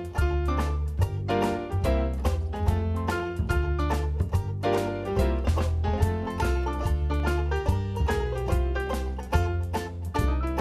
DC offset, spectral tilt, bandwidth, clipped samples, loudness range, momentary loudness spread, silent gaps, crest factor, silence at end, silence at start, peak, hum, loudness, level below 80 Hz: under 0.1%; -7 dB/octave; 14 kHz; under 0.1%; 1 LU; 2 LU; none; 16 dB; 0 s; 0 s; -10 dBFS; none; -28 LUFS; -30 dBFS